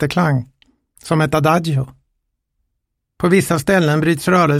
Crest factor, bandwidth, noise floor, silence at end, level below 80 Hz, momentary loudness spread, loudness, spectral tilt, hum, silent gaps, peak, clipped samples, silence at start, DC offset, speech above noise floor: 16 dB; 16 kHz; -74 dBFS; 0 s; -46 dBFS; 7 LU; -16 LUFS; -6 dB/octave; none; none; -2 dBFS; under 0.1%; 0 s; under 0.1%; 60 dB